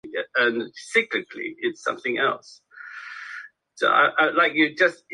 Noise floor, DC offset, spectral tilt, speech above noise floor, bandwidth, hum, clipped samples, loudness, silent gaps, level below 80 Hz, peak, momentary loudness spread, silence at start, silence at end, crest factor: -41 dBFS; under 0.1%; -3.5 dB/octave; 19 dB; 11 kHz; none; under 0.1%; -22 LUFS; none; -78 dBFS; -4 dBFS; 18 LU; 0.05 s; 0 s; 20 dB